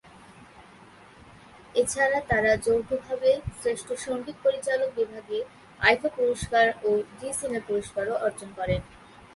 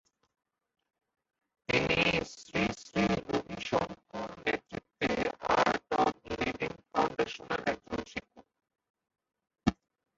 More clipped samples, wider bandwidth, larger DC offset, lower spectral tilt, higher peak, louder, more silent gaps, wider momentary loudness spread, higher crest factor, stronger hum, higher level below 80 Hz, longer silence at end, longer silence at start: neither; first, 11.5 kHz vs 8 kHz; neither; about the same, -4 dB/octave vs -5 dB/octave; first, -6 dBFS vs -10 dBFS; first, -26 LUFS vs -32 LUFS; second, none vs 8.90-8.94 s; about the same, 9 LU vs 11 LU; about the same, 22 dB vs 24 dB; neither; first, -50 dBFS vs -56 dBFS; about the same, 0.4 s vs 0.45 s; second, 0.35 s vs 1.7 s